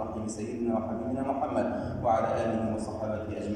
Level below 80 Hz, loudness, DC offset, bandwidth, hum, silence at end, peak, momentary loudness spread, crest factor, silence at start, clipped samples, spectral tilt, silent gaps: -52 dBFS; -31 LUFS; under 0.1%; 10.5 kHz; none; 0 s; -14 dBFS; 7 LU; 16 dB; 0 s; under 0.1%; -7 dB/octave; none